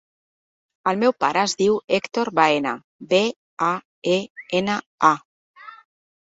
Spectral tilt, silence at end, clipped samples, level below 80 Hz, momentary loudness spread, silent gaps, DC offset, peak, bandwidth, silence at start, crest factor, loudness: -4 dB/octave; 0.65 s; under 0.1%; -66 dBFS; 7 LU; 2.84-2.99 s, 3.36-3.57 s, 3.85-4.02 s, 4.30-4.35 s, 4.86-4.98 s, 5.25-5.54 s; under 0.1%; -2 dBFS; 8 kHz; 0.85 s; 20 dB; -21 LUFS